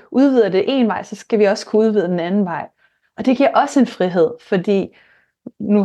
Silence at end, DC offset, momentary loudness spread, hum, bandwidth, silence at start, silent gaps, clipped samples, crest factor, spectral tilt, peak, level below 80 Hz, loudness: 0 s; under 0.1%; 9 LU; none; 9.8 kHz; 0.1 s; none; under 0.1%; 14 dB; -6.5 dB/octave; -2 dBFS; -66 dBFS; -17 LUFS